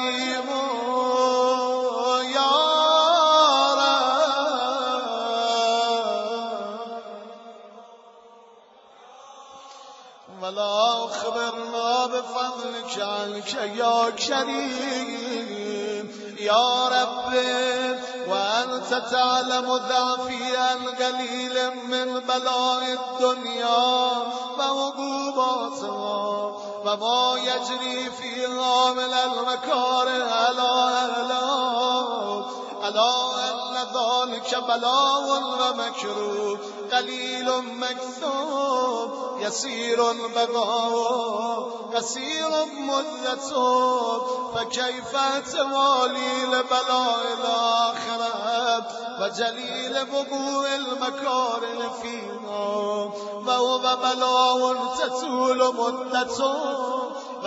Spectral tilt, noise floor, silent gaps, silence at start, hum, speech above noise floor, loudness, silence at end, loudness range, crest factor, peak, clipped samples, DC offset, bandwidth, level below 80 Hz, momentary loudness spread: -1.5 dB/octave; -51 dBFS; none; 0 s; none; 27 dB; -23 LUFS; 0 s; 6 LU; 18 dB; -6 dBFS; under 0.1%; under 0.1%; 8 kHz; -72 dBFS; 9 LU